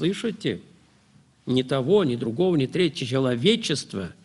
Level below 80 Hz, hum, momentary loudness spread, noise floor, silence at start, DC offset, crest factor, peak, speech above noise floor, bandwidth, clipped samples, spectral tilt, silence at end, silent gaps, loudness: -62 dBFS; none; 9 LU; -58 dBFS; 0 s; under 0.1%; 18 dB; -6 dBFS; 34 dB; 11.5 kHz; under 0.1%; -5.5 dB/octave; 0.15 s; none; -24 LUFS